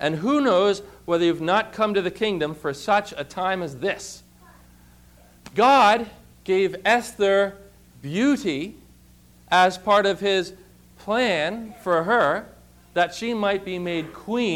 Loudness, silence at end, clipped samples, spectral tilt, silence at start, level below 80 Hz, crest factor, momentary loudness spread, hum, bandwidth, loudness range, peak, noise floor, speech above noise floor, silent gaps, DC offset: -22 LUFS; 0 s; under 0.1%; -4.5 dB/octave; 0 s; -56 dBFS; 16 dB; 12 LU; 60 Hz at -55 dBFS; 16.5 kHz; 4 LU; -8 dBFS; -52 dBFS; 30 dB; none; under 0.1%